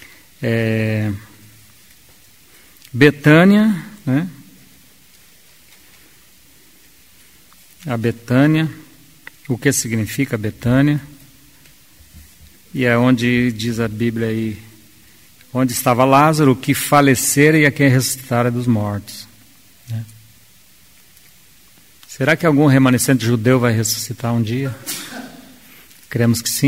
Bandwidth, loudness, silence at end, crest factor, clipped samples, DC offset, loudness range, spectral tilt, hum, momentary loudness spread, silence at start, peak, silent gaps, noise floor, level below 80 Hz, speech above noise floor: 16 kHz; -16 LUFS; 0 s; 18 dB; under 0.1%; 0.3%; 10 LU; -5.5 dB/octave; none; 17 LU; 0.4 s; 0 dBFS; none; -50 dBFS; -50 dBFS; 34 dB